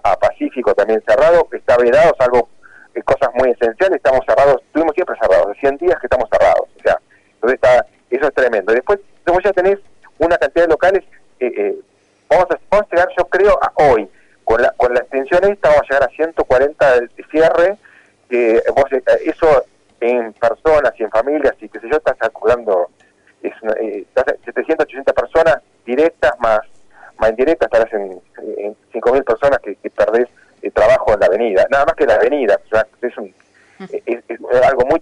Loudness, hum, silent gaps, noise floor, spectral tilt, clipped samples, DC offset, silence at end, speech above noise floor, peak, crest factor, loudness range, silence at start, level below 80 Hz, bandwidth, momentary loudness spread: -15 LUFS; none; none; -50 dBFS; -5.5 dB/octave; under 0.1%; under 0.1%; 0 s; 36 dB; -4 dBFS; 10 dB; 3 LU; 0.05 s; -40 dBFS; 10.5 kHz; 11 LU